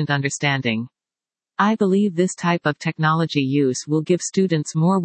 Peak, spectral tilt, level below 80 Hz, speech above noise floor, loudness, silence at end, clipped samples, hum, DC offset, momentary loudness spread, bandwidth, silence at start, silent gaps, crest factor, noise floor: -4 dBFS; -5.5 dB/octave; -68 dBFS; over 70 dB; -20 LUFS; 0 s; under 0.1%; none; under 0.1%; 5 LU; 8.8 kHz; 0 s; none; 18 dB; under -90 dBFS